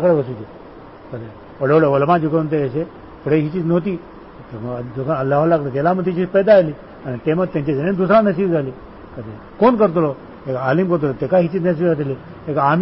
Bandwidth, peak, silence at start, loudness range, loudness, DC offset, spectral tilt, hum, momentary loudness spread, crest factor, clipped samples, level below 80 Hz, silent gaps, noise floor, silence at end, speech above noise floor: 5.8 kHz; -4 dBFS; 0 s; 3 LU; -17 LUFS; 0.1%; -13 dB/octave; none; 19 LU; 14 dB; under 0.1%; -48 dBFS; none; -38 dBFS; 0 s; 21 dB